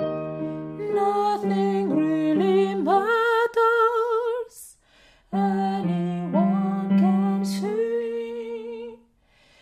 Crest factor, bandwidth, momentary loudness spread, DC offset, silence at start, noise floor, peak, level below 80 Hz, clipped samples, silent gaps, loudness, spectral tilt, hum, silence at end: 14 dB; 14 kHz; 12 LU; under 0.1%; 0 s; -60 dBFS; -10 dBFS; -64 dBFS; under 0.1%; none; -23 LUFS; -7.5 dB/octave; none; 0.65 s